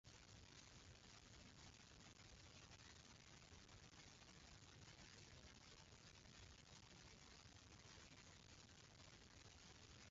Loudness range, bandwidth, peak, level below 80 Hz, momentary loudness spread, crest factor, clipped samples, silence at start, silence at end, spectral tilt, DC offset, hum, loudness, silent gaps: 0 LU; 7.6 kHz; -52 dBFS; -74 dBFS; 1 LU; 14 dB; under 0.1%; 0.05 s; 0 s; -3 dB/octave; under 0.1%; none; -64 LUFS; none